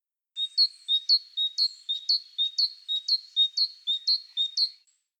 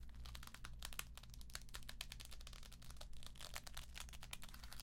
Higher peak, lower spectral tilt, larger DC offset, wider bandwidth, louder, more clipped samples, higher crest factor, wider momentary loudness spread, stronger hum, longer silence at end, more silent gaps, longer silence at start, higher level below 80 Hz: first, -14 dBFS vs -24 dBFS; second, 9 dB/octave vs -2 dB/octave; neither; second, 14 kHz vs 16.5 kHz; first, -25 LUFS vs -54 LUFS; neither; second, 16 dB vs 28 dB; about the same, 6 LU vs 7 LU; neither; first, 0.5 s vs 0 s; neither; first, 0.35 s vs 0 s; second, under -90 dBFS vs -56 dBFS